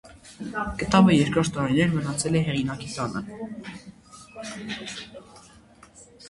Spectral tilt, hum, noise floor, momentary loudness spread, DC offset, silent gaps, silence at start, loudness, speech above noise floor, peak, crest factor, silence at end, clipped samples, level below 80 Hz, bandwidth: -5.5 dB/octave; none; -52 dBFS; 21 LU; under 0.1%; none; 0.05 s; -24 LUFS; 27 dB; -4 dBFS; 22 dB; 0 s; under 0.1%; -50 dBFS; 11.5 kHz